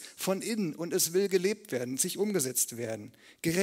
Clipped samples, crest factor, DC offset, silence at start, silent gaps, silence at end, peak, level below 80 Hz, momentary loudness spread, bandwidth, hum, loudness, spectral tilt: under 0.1%; 18 dB; under 0.1%; 0 s; none; 0 s; -12 dBFS; -72 dBFS; 10 LU; 16.5 kHz; none; -30 LUFS; -3.5 dB/octave